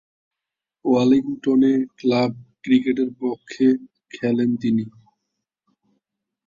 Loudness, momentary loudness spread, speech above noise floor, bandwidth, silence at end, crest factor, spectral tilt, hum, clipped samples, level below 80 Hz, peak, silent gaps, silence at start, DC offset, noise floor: -21 LUFS; 11 LU; 67 dB; 7.4 kHz; 1.55 s; 16 dB; -7.5 dB/octave; none; under 0.1%; -64 dBFS; -6 dBFS; none; 0.85 s; under 0.1%; -86 dBFS